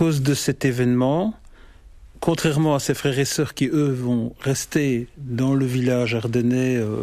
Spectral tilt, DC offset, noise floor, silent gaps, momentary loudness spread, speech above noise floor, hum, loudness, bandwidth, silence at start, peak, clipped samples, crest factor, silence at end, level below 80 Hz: -6 dB/octave; under 0.1%; -45 dBFS; none; 5 LU; 24 dB; none; -21 LUFS; 15.5 kHz; 0 s; -8 dBFS; under 0.1%; 14 dB; 0 s; -48 dBFS